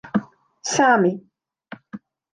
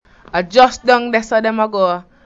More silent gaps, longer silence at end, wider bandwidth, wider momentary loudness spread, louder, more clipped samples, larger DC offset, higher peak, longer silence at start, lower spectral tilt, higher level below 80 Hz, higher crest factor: neither; about the same, 0.35 s vs 0.25 s; first, 10.5 kHz vs 8 kHz; first, 25 LU vs 7 LU; second, -20 LUFS vs -15 LUFS; neither; neither; second, -4 dBFS vs 0 dBFS; second, 0.05 s vs 0.35 s; about the same, -4 dB/octave vs -4 dB/octave; second, -66 dBFS vs -48 dBFS; about the same, 18 dB vs 14 dB